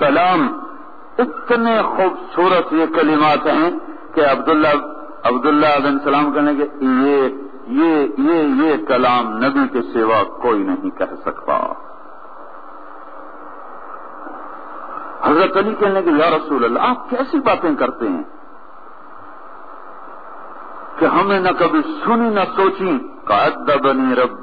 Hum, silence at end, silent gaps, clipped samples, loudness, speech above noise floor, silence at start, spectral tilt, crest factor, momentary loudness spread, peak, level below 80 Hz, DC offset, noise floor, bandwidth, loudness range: none; 0 s; none; under 0.1%; -16 LUFS; 25 dB; 0 s; -8.5 dB/octave; 16 dB; 21 LU; -2 dBFS; -56 dBFS; 2%; -40 dBFS; 5 kHz; 10 LU